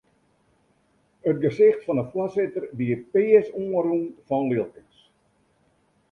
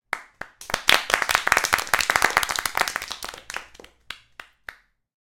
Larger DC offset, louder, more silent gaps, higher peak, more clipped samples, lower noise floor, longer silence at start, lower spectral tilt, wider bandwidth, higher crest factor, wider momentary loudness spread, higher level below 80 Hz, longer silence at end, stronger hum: neither; about the same, -23 LUFS vs -21 LUFS; neither; second, -6 dBFS vs 0 dBFS; neither; first, -66 dBFS vs -48 dBFS; first, 1.25 s vs 0.1 s; first, -9.5 dB/octave vs 0 dB/octave; second, 6 kHz vs 17 kHz; second, 20 dB vs 26 dB; second, 9 LU vs 22 LU; second, -66 dBFS vs -52 dBFS; first, 1.4 s vs 0.5 s; neither